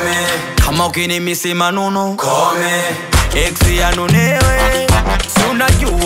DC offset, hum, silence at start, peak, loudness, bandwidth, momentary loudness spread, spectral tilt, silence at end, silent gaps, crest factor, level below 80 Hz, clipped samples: under 0.1%; none; 0 s; 0 dBFS; -13 LUFS; 16.5 kHz; 4 LU; -4 dB/octave; 0 s; none; 12 dB; -20 dBFS; under 0.1%